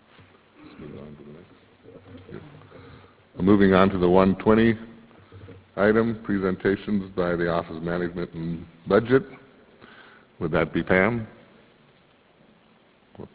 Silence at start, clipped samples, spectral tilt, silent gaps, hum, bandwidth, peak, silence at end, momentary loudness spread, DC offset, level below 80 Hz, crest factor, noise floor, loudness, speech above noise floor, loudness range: 0.8 s; under 0.1%; -11 dB/octave; none; none; 4 kHz; -2 dBFS; 0.1 s; 24 LU; under 0.1%; -48 dBFS; 24 dB; -58 dBFS; -23 LUFS; 35 dB; 7 LU